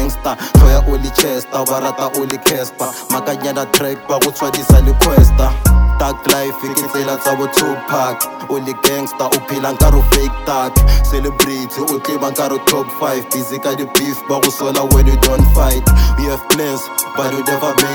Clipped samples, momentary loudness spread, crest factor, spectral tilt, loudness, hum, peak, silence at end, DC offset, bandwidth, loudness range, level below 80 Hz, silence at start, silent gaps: 0.3%; 8 LU; 12 dB; -4.5 dB/octave; -14 LUFS; none; 0 dBFS; 0 s; under 0.1%; 20 kHz; 4 LU; -16 dBFS; 0 s; none